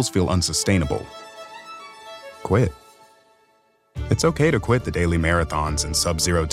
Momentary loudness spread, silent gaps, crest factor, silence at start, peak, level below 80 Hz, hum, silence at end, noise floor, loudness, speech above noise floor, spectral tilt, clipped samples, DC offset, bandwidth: 19 LU; none; 18 dB; 0 s; -4 dBFS; -38 dBFS; none; 0 s; -62 dBFS; -21 LUFS; 41 dB; -4.5 dB/octave; under 0.1%; under 0.1%; 16 kHz